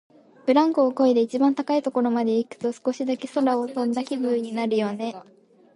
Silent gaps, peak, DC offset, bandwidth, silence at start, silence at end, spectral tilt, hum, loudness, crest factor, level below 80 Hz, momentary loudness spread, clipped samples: none; -6 dBFS; under 0.1%; 11 kHz; 0.45 s; 0.55 s; -6 dB/octave; none; -23 LUFS; 16 dB; -76 dBFS; 8 LU; under 0.1%